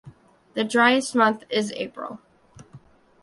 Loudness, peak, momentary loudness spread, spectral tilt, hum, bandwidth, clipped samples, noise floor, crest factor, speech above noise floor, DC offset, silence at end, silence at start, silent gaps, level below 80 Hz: -22 LUFS; -4 dBFS; 18 LU; -3.5 dB/octave; none; 11.5 kHz; under 0.1%; -51 dBFS; 20 dB; 29 dB; under 0.1%; 0.45 s; 0.05 s; none; -66 dBFS